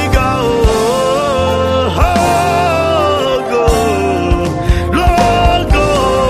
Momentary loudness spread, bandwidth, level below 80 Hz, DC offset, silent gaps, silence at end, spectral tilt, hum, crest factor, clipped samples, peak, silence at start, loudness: 3 LU; 15.5 kHz; -20 dBFS; under 0.1%; none; 0 s; -5.5 dB/octave; none; 12 dB; under 0.1%; 0 dBFS; 0 s; -12 LUFS